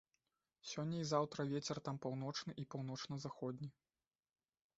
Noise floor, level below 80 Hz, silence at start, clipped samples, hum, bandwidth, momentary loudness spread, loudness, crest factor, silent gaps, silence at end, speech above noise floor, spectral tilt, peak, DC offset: under -90 dBFS; -80 dBFS; 0.65 s; under 0.1%; none; 8 kHz; 10 LU; -44 LUFS; 22 dB; none; 1.05 s; over 46 dB; -5.5 dB/octave; -22 dBFS; under 0.1%